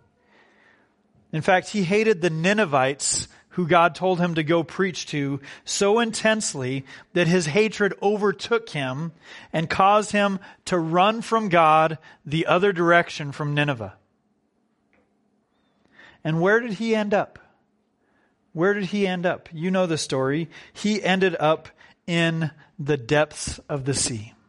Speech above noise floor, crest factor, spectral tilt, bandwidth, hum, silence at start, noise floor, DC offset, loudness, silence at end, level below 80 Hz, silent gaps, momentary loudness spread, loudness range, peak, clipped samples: 46 dB; 22 dB; -4.5 dB/octave; 11.5 kHz; none; 1.35 s; -69 dBFS; under 0.1%; -22 LUFS; 0.2 s; -56 dBFS; none; 11 LU; 6 LU; -2 dBFS; under 0.1%